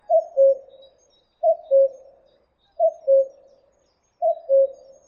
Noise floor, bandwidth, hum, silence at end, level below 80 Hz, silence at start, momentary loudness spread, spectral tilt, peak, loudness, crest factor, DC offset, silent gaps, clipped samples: -66 dBFS; 4.1 kHz; none; 0.35 s; -74 dBFS; 0.1 s; 7 LU; -4.5 dB/octave; -8 dBFS; -21 LUFS; 14 dB; under 0.1%; none; under 0.1%